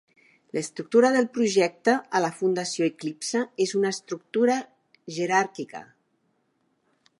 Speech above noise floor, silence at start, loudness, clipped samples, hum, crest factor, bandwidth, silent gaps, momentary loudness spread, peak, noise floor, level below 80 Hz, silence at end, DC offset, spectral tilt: 47 dB; 0.55 s; -25 LUFS; under 0.1%; none; 18 dB; 11.5 kHz; none; 12 LU; -8 dBFS; -71 dBFS; -80 dBFS; 1.35 s; under 0.1%; -4 dB/octave